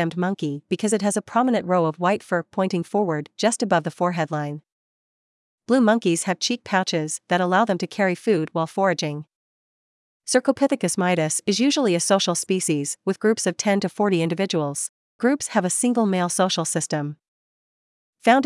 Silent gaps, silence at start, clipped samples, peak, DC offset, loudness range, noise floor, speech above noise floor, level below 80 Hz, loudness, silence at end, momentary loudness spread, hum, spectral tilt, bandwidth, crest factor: 4.72-5.58 s, 9.35-10.20 s, 14.89-15.19 s, 17.28-18.13 s; 0 s; under 0.1%; -2 dBFS; under 0.1%; 3 LU; under -90 dBFS; over 68 dB; -74 dBFS; -22 LUFS; 0 s; 7 LU; none; -4.5 dB/octave; 12 kHz; 20 dB